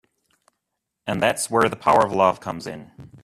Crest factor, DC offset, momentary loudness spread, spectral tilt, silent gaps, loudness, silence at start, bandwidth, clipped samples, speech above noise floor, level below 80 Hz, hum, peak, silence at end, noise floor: 20 dB; under 0.1%; 17 LU; -4 dB/octave; none; -20 LUFS; 1.05 s; 15 kHz; under 0.1%; 60 dB; -56 dBFS; none; -2 dBFS; 0.15 s; -80 dBFS